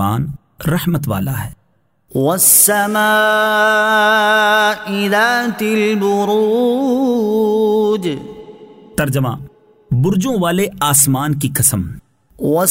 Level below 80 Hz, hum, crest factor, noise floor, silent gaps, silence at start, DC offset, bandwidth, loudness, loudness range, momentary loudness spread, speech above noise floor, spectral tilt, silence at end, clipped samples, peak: -46 dBFS; none; 14 dB; -61 dBFS; none; 0 s; under 0.1%; 16.5 kHz; -14 LUFS; 6 LU; 12 LU; 46 dB; -4 dB/octave; 0 s; under 0.1%; 0 dBFS